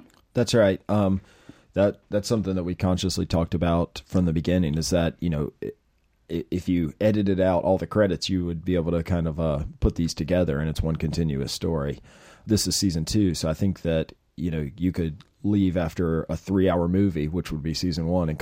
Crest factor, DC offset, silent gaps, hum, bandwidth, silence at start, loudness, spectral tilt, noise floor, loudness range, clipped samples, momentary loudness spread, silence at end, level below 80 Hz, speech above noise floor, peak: 18 dB; under 0.1%; none; none; 15.5 kHz; 0.35 s; -25 LUFS; -6 dB/octave; -58 dBFS; 2 LU; under 0.1%; 8 LU; 0 s; -40 dBFS; 34 dB; -8 dBFS